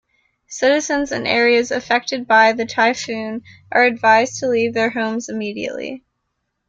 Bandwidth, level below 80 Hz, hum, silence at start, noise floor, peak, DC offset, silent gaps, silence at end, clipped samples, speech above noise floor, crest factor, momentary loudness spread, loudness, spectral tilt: 7.8 kHz; -58 dBFS; none; 0.5 s; -74 dBFS; -2 dBFS; under 0.1%; none; 0.7 s; under 0.1%; 56 dB; 16 dB; 14 LU; -17 LUFS; -3 dB/octave